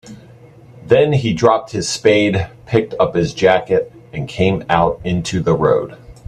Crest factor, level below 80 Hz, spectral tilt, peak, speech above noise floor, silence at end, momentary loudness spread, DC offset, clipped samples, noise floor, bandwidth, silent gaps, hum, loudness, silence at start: 16 dB; -42 dBFS; -5.5 dB/octave; 0 dBFS; 26 dB; 0.15 s; 8 LU; under 0.1%; under 0.1%; -42 dBFS; 11 kHz; none; none; -16 LUFS; 0.05 s